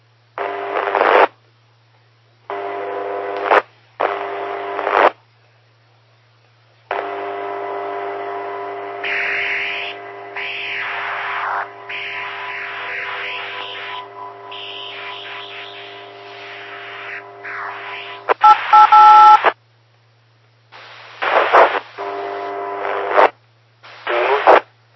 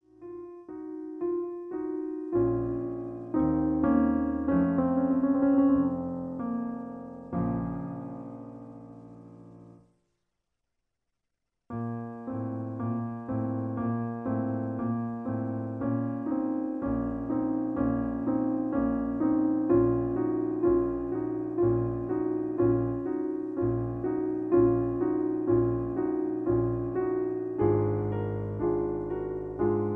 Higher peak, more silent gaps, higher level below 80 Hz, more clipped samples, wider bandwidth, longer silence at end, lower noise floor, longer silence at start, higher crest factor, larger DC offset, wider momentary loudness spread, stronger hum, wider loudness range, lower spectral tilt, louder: first, 0 dBFS vs -12 dBFS; neither; second, -66 dBFS vs -50 dBFS; neither; first, 6 kHz vs 3 kHz; first, 0.35 s vs 0 s; second, -54 dBFS vs -84 dBFS; first, 0.35 s vs 0.2 s; about the same, 18 dB vs 16 dB; neither; first, 20 LU vs 12 LU; neither; first, 17 LU vs 11 LU; second, -3.5 dB/octave vs -12.5 dB/octave; first, -16 LUFS vs -29 LUFS